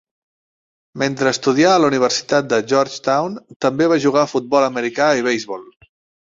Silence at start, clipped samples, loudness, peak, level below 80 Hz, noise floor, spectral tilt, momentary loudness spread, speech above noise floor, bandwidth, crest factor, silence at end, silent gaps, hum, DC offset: 0.95 s; under 0.1%; -17 LUFS; -2 dBFS; -60 dBFS; under -90 dBFS; -4.5 dB/octave; 9 LU; over 73 dB; 7.8 kHz; 16 dB; 0.55 s; 3.56-3.60 s; none; under 0.1%